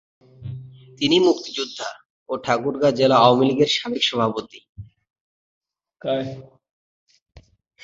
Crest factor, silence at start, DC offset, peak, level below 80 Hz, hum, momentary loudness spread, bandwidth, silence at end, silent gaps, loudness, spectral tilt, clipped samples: 20 dB; 0.4 s; under 0.1%; -2 dBFS; -58 dBFS; none; 21 LU; 7.8 kHz; 0.45 s; 2.05-2.26 s, 4.69-4.73 s, 5.10-5.14 s, 5.21-5.61 s, 6.71-7.06 s, 7.22-7.26 s; -20 LUFS; -5 dB/octave; under 0.1%